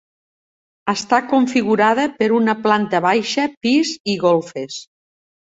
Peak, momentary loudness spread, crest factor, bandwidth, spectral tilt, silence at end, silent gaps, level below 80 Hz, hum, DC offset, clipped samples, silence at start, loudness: -2 dBFS; 11 LU; 16 dB; 8 kHz; -4.5 dB/octave; 0.75 s; 3.57-3.61 s, 4.00-4.05 s; -62 dBFS; none; under 0.1%; under 0.1%; 0.85 s; -17 LUFS